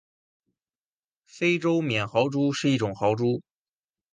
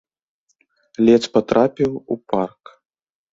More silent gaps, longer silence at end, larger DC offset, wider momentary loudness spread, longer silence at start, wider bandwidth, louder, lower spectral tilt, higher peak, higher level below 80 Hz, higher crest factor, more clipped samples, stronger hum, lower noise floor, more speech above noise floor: neither; second, 0.7 s vs 0.85 s; neither; second, 3 LU vs 13 LU; first, 1.35 s vs 1 s; first, 9.8 kHz vs 7.8 kHz; second, -25 LUFS vs -18 LUFS; about the same, -6 dB/octave vs -6.5 dB/octave; second, -8 dBFS vs -2 dBFS; second, -64 dBFS vs -56 dBFS; about the same, 20 dB vs 20 dB; neither; neither; first, under -90 dBFS vs -65 dBFS; first, over 66 dB vs 47 dB